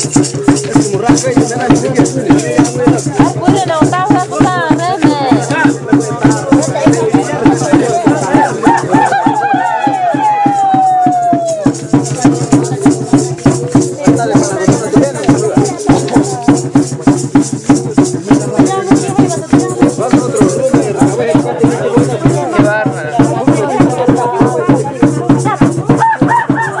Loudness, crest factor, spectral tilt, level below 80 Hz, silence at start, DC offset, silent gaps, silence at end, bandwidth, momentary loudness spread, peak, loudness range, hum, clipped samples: -10 LUFS; 10 dB; -6 dB/octave; -38 dBFS; 0 s; 0.4%; none; 0 s; 11.5 kHz; 3 LU; 0 dBFS; 1 LU; none; under 0.1%